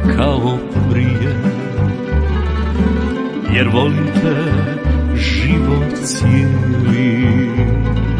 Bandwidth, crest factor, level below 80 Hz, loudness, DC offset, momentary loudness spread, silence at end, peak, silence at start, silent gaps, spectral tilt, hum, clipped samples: 10.5 kHz; 14 dB; -22 dBFS; -15 LUFS; under 0.1%; 5 LU; 0 s; 0 dBFS; 0 s; none; -6.5 dB/octave; none; under 0.1%